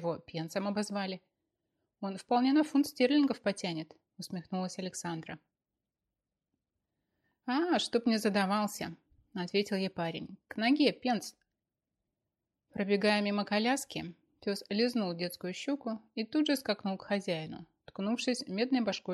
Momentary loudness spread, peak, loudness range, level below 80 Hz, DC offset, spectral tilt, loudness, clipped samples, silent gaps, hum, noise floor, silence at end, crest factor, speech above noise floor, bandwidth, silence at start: 15 LU; -14 dBFS; 6 LU; -76 dBFS; under 0.1%; -5 dB/octave; -33 LUFS; under 0.1%; none; none; -90 dBFS; 0 s; 20 dB; 57 dB; 13.5 kHz; 0 s